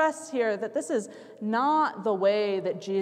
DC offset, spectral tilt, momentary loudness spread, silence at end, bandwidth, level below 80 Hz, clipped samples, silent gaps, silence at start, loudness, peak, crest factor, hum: under 0.1%; -5 dB/octave; 7 LU; 0 s; 13 kHz; -84 dBFS; under 0.1%; none; 0 s; -27 LUFS; -14 dBFS; 14 dB; none